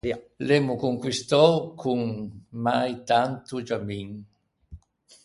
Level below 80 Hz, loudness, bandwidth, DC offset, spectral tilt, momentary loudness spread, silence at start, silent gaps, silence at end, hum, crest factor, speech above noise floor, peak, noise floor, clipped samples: -56 dBFS; -25 LUFS; 11.5 kHz; under 0.1%; -5.5 dB/octave; 16 LU; 0.05 s; none; 0.45 s; none; 22 dB; 25 dB; -4 dBFS; -50 dBFS; under 0.1%